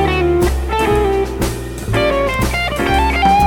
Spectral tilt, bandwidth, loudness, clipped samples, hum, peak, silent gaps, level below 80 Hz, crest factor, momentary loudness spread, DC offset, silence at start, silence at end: -5.5 dB/octave; 17.5 kHz; -16 LUFS; under 0.1%; none; -2 dBFS; none; -22 dBFS; 12 dB; 6 LU; under 0.1%; 0 s; 0 s